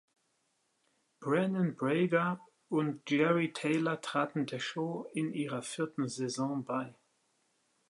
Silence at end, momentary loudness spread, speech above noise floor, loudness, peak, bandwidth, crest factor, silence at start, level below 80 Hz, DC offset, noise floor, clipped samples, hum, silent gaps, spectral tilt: 1 s; 8 LU; 45 dB; -33 LUFS; -14 dBFS; 11.5 kHz; 20 dB; 1.2 s; -84 dBFS; under 0.1%; -77 dBFS; under 0.1%; none; none; -6 dB/octave